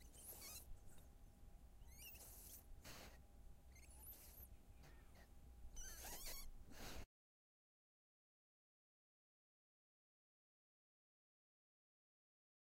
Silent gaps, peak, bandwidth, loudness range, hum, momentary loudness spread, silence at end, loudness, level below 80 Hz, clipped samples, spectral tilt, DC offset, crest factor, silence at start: none; -40 dBFS; 16 kHz; 5 LU; none; 14 LU; 5.6 s; -59 LUFS; -64 dBFS; under 0.1%; -2.5 dB/octave; under 0.1%; 22 dB; 0 s